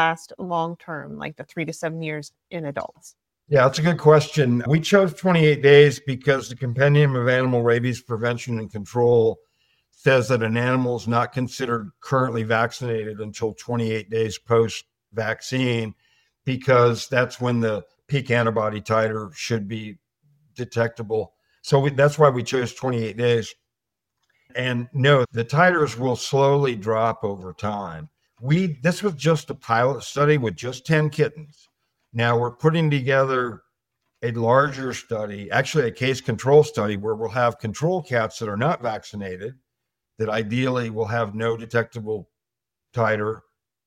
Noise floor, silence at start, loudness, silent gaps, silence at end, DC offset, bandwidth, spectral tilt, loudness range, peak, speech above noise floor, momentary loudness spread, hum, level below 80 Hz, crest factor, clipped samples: -86 dBFS; 0 s; -22 LUFS; none; 0.5 s; under 0.1%; 14 kHz; -6 dB/octave; 8 LU; -2 dBFS; 65 dB; 14 LU; none; -60 dBFS; 20 dB; under 0.1%